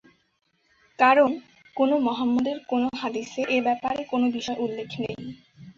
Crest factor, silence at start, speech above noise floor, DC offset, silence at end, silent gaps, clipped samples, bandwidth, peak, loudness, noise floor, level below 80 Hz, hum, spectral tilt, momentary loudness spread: 20 dB; 1 s; 40 dB; under 0.1%; 0.05 s; none; under 0.1%; 7.4 kHz; -6 dBFS; -24 LUFS; -64 dBFS; -64 dBFS; none; -5 dB/octave; 13 LU